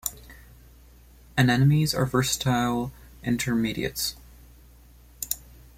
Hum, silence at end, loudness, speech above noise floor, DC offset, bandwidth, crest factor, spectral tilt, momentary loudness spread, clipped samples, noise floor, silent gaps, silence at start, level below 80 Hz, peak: none; 0.4 s; -25 LUFS; 28 dB; under 0.1%; 16.5 kHz; 20 dB; -5 dB/octave; 13 LU; under 0.1%; -52 dBFS; none; 0.05 s; -48 dBFS; -6 dBFS